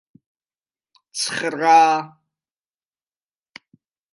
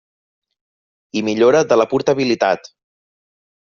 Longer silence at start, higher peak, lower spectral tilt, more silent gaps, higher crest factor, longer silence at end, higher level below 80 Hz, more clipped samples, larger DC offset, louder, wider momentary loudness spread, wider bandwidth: about the same, 1.15 s vs 1.15 s; about the same, -2 dBFS vs -2 dBFS; second, -2.5 dB/octave vs -4 dB/octave; neither; first, 22 dB vs 16 dB; first, 2.05 s vs 1.05 s; second, -76 dBFS vs -60 dBFS; neither; neither; about the same, -17 LUFS vs -16 LUFS; first, 18 LU vs 10 LU; first, 11.5 kHz vs 7.2 kHz